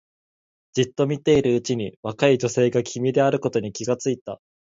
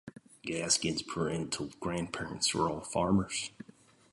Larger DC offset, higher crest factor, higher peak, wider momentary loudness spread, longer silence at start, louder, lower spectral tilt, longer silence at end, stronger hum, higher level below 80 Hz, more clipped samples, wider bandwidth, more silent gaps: neither; about the same, 18 dB vs 22 dB; first, -4 dBFS vs -14 dBFS; second, 10 LU vs 14 LU; first, 0.75 s vs 0.05 s; first, -22 LUFS vs -33 LUFS; first, -5.5 dB/octave vs -3.5 dB/octave; second, 0.35 s vs 0.6 s; neither; about the same, -56 dBFS vs -58 dBFS; neither; second, 7.8 kHz vs 11.5 kHz; first, 1.97-2.03 s, 4.21-4.26 s vs none